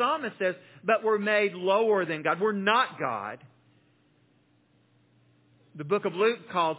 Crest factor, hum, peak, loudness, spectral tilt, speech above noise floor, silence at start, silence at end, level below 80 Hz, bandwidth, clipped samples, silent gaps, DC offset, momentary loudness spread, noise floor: 20 dB; none; -8 dBFS; -27 LUFS; -8.5 dB/octave; 39 dB; 0 s; 0 s; -82 dBFS; 4 kHz; under 0.1%; none; under 0.1%; 10 LU; -65 dBFS